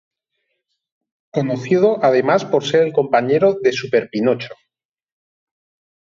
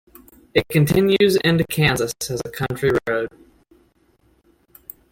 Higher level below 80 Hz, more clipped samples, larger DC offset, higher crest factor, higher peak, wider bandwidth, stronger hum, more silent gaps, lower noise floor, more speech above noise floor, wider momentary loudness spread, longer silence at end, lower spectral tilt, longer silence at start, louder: second, -64 dBFS vs -46 dBFS; neither; neither; about the same, 16 dB vs 18 dB; about the same, -2 dBFS vs -4 dBFS; second, 7.6 kHz vs 17 kHz; neither; neither; first, -83 dBFS vs -60 dBFS; first, 67 dB vs 41 dB; second, 8 LU vs 14 LU; second, 1.6 s vs 1.85 s; about the same, -6 dB/octave vs -5.5 dB/octave; first, 1.35 s vs 0.55 s; about the same, -17 LUFS vs -19 LUFS